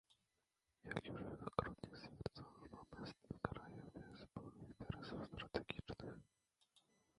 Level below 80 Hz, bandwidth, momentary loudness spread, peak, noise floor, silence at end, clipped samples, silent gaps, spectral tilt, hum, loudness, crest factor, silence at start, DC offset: -66 dBFS; 11 kHz; 13 LU; -20 dBFS; -89 dBFS; 0.4 s; under 0.1%; none; -6.5 dB/octave; none; -51 LUFS; 32 dB; 0.1 s; under 0.1%